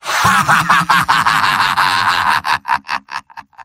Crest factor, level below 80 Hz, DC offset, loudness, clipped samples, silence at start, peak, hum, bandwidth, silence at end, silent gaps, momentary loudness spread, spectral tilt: 14 dB; -46 dBFS; under 0.1%; -13 LUFS; under 0.1%; 0.05 s; 0 dBFS; none; 16.5 kHz; 0 s; none; 11 LU; -2 dB/octave